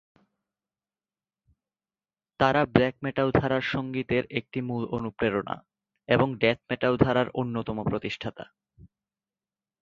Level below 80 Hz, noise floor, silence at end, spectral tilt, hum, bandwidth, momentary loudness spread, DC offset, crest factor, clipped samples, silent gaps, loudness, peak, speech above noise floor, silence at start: -52 dBFS; under -90 dBFS; 0.95 s; -7.5 dB/octave; none; 7.4 kHz; 9 LU; under 0.1%; 26 dB; under 0.1%; none; -27 LUFS; -4 dBFS; over 64 dB; 2.4 s